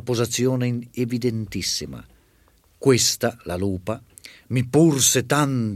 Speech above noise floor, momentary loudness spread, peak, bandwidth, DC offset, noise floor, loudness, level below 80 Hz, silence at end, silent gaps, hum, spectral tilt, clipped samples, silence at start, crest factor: 37 dB; 11 LU; -4 dBFS; 16 kHz; under 0.1%; -58 dBFS; -21 LUFS; -54 dBFS; 0 s; none; none; -4 dB/octave; under 0.1%; 0.05 s; 18 dB